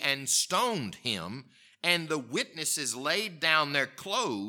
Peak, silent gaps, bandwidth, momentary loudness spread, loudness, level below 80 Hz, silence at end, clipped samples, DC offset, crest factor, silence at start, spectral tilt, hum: -8 dBFS; none; 19 kHz; 8 LU; -28 LUFS; -76 dBFS; 0 s; under 0.1%; under 0.1%; 22 dB; 0 s; -1.5 dB/octave; none